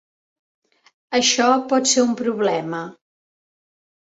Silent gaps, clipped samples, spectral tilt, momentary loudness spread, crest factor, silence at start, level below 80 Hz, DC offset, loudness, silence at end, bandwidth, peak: none; under 0.1%; -2 dB/octave; 13 LU; 20 dB; 1.1 s; -68 dBFS; under 0.1%; -18 LUFS; 1.15 s; 8 kHz; -2 dBFS